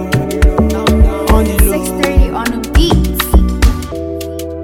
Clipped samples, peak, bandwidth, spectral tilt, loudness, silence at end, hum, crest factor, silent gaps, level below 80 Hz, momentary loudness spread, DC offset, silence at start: under 0.1%; 0 dBFS; 18.5 kHz; -5.5 dB/octave; -13 LUFS; 0 s; none; 12 dB; none; -14 dBFS; 10 LU; under 0.1%; 0 s